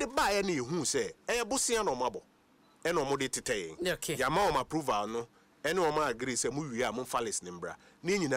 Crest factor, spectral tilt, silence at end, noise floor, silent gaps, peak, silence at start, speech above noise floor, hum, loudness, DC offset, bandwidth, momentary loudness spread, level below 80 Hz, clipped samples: 14 dB; -3 dB/octave; 0 s; -65 dBFS; none; -18 dBFS; 0 s; 32 dB; none; -32 LUFS; under 0.1%; 16 kHz; 9 LU; -58 dBFS; under 0.1%